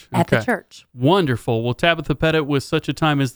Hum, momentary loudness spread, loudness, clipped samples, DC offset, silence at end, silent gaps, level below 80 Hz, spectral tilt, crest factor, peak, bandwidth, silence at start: none; 5 LU; -19 LUFS; under 0.1%; under 0.1%; 0.05 s; none; -42 dBFS; -6 dB/octave; 18 dB; 0 dBFS; over 20 kHz; 0.1 s